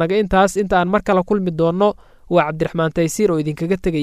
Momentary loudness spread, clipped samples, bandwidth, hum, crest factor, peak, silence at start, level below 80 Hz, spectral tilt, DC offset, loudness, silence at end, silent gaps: 5 LU; under 0.1%; 15 kHz; none; 16 dB; -2 dBFS; 0 s; -38 dBFS; -6 dB/octave; under 0.1%; -18 LUFS; 0 s; none